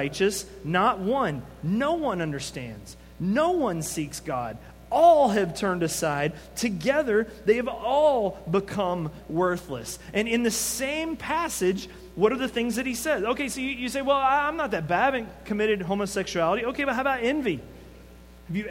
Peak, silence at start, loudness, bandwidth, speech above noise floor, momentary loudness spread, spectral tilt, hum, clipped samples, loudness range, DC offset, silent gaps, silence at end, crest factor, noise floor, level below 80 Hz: -8 dBFS; 0 s; -26 LUFS; 16.5 kHz; 22 dB; 10 LU; -4.5 dB/octave; none; under 0.1%; 3 LU; under 0.1%; none; 0 s; 18 dB; -48 dBFS; -50 dBFS